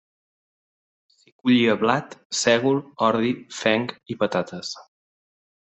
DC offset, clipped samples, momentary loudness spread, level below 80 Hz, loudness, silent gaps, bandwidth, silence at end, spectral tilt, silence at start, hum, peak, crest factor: under 0.1%; under 0.1%; 12 LU; -66 dBFS; -22 LUFS; 2.25-2.30 s; 8.4 kHz; 0.95 s; -4.5 dB/octave; 1.45 s; none; -2 dBFS; 22 dB